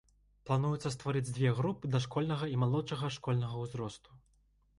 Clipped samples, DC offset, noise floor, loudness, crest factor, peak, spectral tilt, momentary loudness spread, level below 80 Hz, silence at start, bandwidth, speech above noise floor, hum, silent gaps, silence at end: under 0.1%; under 0.1%; -70 dBFS; -34 LUFS; 16 dB; -18 dBFS; -6.5 dB/octave; 9 LU; -62 dBFS; 0.45 s; 11.5 kHz; 36 dB; none; none; 0.6 s